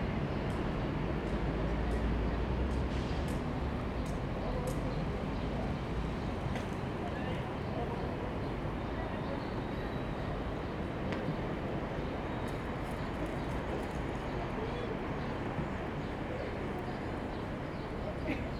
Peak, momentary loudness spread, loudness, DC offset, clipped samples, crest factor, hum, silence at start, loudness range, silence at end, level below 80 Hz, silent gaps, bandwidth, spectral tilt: -20 dBFS; 4 LU; -37 LUFS; under 0.1%; under 0.1%; 16 dB; none; 0 s; 3 LU; 0 s; -42 dBFS; none; 13 kHz; -7.5 dB/octave